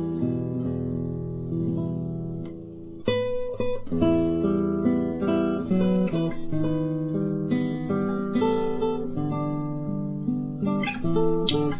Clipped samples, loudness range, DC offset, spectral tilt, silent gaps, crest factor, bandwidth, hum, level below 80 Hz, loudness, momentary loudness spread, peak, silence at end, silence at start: under 0.1%; 5 LU; under 0.1%; -11.5 dB/octave; none; 16 dB; 4 kHz; none; -46 dBFS; -26 LUFS; 7 LU; -8 dBFS; 0 s; 0 s